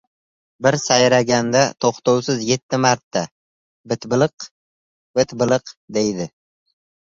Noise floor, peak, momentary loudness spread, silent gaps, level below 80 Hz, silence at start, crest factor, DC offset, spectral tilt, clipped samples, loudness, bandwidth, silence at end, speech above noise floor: under -90 dBFS; -2 dBFS; 12 LU; 2.62-2.69 s, 3.03-3.11 s, 3.31-3.84 s, 4.51-5.14 s, 5.77-5.88 s; -58 dBFS; 0.6 s; 18 dB; under 0.1%; -4 dB/octave; under 0.1%; -19 LUFS; 7.8 kHz; 0.9 s; over 72 dB